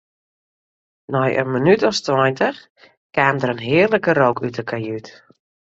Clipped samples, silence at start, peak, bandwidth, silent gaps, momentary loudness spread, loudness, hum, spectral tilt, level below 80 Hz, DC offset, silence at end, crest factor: under 0.1%; 1.1 s; -2 dBFS; 8 kHz; 2.70-2.75 s, 2.97-3.10 s; 10 LU; -18 LUFS; none; -6 dB/octave; -60 dBFS; under 0.1%; 0.65 s; 18 dB